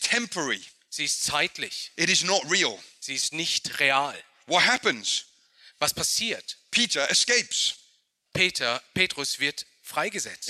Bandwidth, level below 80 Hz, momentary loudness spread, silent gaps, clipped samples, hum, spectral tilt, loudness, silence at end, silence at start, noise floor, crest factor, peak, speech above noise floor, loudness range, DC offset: 16 kHz; -66 dBFS; 11 LU; none; under 0.1%; none; -1 dB/octave; -24 LUFS; 0 s; 0 s; -65 dBFS; 22 dB; -6 dBFS; 39 dB; 2 LU; under 0.1%